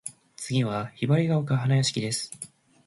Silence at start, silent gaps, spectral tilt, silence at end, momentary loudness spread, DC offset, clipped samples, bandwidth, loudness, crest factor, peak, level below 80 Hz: 0.05 s; none; -5.5 dB/octave; 0.4 s; 17 LU; under 0.1%; under 0.1%; 11.5 kHz; -26 LUFS; 16 dB; -10 dBFS; -62 dBFS